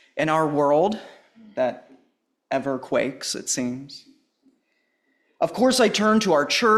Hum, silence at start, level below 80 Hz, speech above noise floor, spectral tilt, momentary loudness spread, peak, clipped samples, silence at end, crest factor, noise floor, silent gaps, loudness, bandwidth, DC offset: none; 0.15 s; -64 dBFS; 49 dB; -3.5 dB/octave; 16 LU; -6 dBFS; under 0.1%; 0 s; 18 dB; -71 dBFS; none; -22 LUFS; 14 kHz; under 0.1%